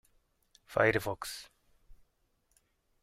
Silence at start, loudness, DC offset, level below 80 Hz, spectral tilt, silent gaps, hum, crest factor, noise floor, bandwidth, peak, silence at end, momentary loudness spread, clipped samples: 0.7 s; -32 LUFS; under 0.1%; -62 dBFS; -4.5 dB/octave; none; none; 26 dB; -75 dBFS; 16 kHz; -12 dBFS; 1.1 s; 14 LU; under 0.1%